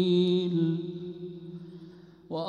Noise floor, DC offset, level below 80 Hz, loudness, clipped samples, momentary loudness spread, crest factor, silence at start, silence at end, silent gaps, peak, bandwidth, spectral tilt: -50 dBFS; under 0.1%; -72 dBFS; -29 LUFS; under 0.1%; 22 LU; 14 dB; 0 s; 0 s; none; -16 dBFS; 7 kHz; -8.5 dB/octave